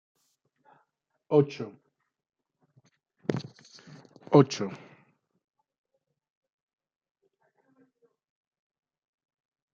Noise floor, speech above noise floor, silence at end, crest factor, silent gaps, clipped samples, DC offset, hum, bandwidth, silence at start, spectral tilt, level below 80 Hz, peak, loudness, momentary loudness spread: -77 dBFS; 53 dB; 4.95 s; 28 dB; none; under 0.1%; under 0.1%; none; 7.4 kHz; 1.3 s; -7 dB/octave; -80 dBFS; -6 dBFS; -27 LUFS; 25 LU